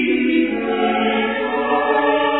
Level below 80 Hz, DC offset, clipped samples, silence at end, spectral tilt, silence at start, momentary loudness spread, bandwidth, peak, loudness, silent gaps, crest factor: -52 dBFS; 0.2%; under 0.1%; 0 s; -8.5 dB/octave; 0 s; 3 LU; 4.1 kHz; -4 dBFS; -18 LUFS; none; 12 dB